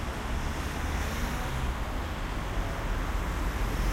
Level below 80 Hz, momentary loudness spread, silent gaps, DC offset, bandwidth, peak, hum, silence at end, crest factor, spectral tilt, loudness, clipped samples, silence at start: -32 dBFS; 2 LU; none; under 0.1%; 16 kHz; -18 dBFS; none; 0 s; 12 dB; -5 dB/octave; -33 LUFS; under 0.1%; 0 s